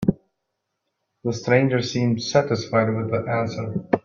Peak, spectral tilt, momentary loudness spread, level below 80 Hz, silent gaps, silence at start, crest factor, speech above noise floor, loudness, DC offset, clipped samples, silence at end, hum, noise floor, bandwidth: -2 dBFS; -6 dB/octave; 10 LU; -54 dBFS; none; 0 s; 22 dB; 57 dB; -22 LUFS; under 0.1%; under 0.1%; 0.05 s; none; -78 dBFS; 7.4 kHz